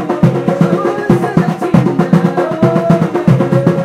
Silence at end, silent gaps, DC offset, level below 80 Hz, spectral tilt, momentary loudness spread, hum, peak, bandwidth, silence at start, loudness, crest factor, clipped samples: 0 s; none; under 0.1%; -42 dBFS; -8.5 dB/octave; 3 LU; none; 0 dBFS; 11.5 kHz; 0 s; -12 LUFS; 12 dB; 0.2%